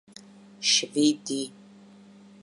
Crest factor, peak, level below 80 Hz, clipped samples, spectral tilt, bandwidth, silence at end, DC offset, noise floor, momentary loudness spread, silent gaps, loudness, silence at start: 20 dB; -10 dBFS; -82 dBFS; under 0.1%; -2 dB/octave; 11.5 kHz; 0.95 s; under 0.1%; -51 dBFS; 11 LU; none; -25 LUFS; 0.6 s